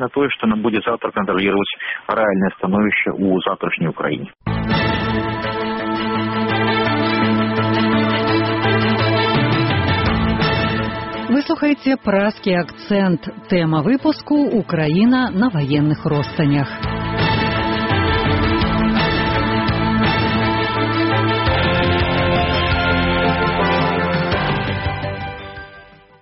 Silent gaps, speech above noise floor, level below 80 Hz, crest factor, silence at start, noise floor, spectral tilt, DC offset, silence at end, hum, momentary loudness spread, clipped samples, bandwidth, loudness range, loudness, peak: none; 25 dB; -34 dBFS; 12 dB; 0 s; -43 dBFS; -4.5 dB/octave; under 0.1%; 0.4 s; none; 6 LU; under 0.1%; 6 kHz; 3 LU; -18 LUFS; -4 dBFS